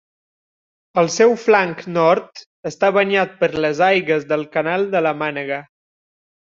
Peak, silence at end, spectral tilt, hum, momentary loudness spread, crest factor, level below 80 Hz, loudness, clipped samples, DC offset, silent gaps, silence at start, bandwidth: -2 dBFS; 0.8 s; -4.5 dB/octave; none; 9 LU; 18 dB; -62 dBFS; -18 LUFS; under 0.1%; under 0.1%; 2.46-2.63 s; 0.95 s; 7.6 kHz